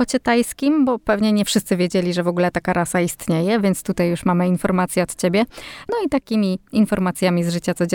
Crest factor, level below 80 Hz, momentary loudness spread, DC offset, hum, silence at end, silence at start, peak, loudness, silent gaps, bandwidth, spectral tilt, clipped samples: 14 dB; -48 dBFS; 3 LU; under 0.1%; none; 0 s; 0 s; -4 dBFS; -19 LUFS; none; 19 kHz; -5.5 dB/octave; under 0.1%